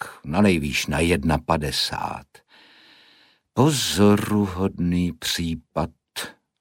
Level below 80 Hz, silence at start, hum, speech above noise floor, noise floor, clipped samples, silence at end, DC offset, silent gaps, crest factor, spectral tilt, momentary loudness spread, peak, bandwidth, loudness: -42 dBFS; 0 s; none; 36 dB; -57 dBFS; under 0.1%; 0.3 s; under 0.1%; none; 18 dB; -5 dB/octave; 13 LU; -4 dBFS; 16.5 kHz; -22 LUFS